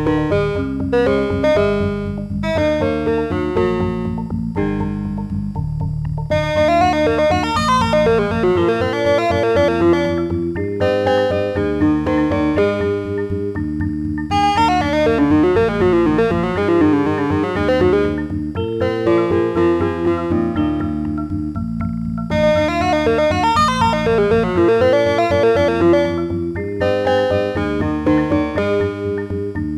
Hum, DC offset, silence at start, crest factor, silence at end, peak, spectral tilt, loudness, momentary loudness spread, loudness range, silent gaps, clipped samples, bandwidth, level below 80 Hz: none; under 0.1%; 0 s; 12 dB; 0 s; -4 dBFS; -7 dB/octave; -17 LUFS; 8 LU; 4 LU; none; under 0.1%; 13 kHz; -32 dBFS